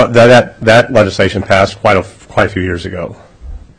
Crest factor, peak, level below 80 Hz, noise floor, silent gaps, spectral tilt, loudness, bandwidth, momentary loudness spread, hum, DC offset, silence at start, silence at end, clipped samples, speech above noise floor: 10 dB; 0 dBFS; -34 dBFS; -29 dBFS; none; -5.5 dB/octave; -10 LUFS; 11 kHz; 14 LU; none; under 0.1%; 0 s; 0.15 s; 0.6%; 20 dB